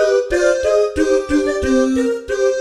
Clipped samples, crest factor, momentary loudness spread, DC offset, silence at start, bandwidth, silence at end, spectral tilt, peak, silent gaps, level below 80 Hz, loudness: under 0.1%; 12 dB; 3 LU; under 0.1%; 0 s; 12.5 kHz; 0 s; -4.5 dB/octave; -2 dBFS; none; -36 dBFS; -16 LUFS